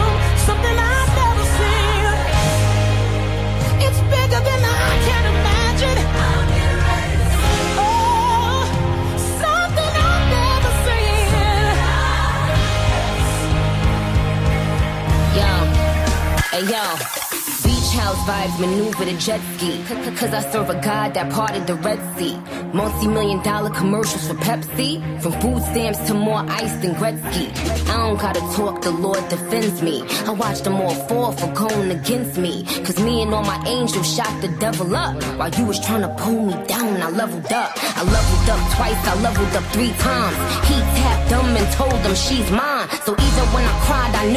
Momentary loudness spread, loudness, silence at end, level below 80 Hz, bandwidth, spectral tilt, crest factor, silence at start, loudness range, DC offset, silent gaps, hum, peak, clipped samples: 5 LU; -19 LUFS; 0 s; -22 dBFS; 16 kHz; -5 dB/octave; 12 dB; 0 s; 4 LU; under 0.1%; none; none; -6 dBFS; under 0.1%